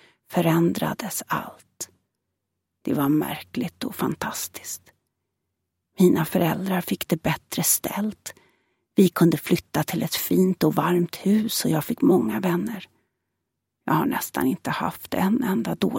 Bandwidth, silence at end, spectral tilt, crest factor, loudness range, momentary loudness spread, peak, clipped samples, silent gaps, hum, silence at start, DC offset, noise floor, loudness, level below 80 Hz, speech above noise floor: 17 kHz; 0 s; -5 dB/octave; 20 dB; 6 LU; 12 LU; -4 dBFS; under 0.1%; none; none; 0.3 s; under 0.1%; -81 dBFS; -23 LUFS; -60 dBFS; 58 dB